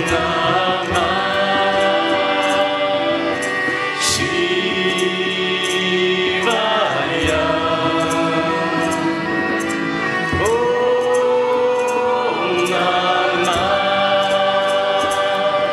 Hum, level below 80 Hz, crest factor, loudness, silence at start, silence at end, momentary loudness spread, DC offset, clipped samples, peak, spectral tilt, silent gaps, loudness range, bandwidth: none; -46 dBFS; 14 dB; -17 LUFS; 0 s; 0 s; 3 LU; under 0.1%; under 0.1%; -2 dBFS; -3.5 dB/octave; none; 2 LU; 14 kHz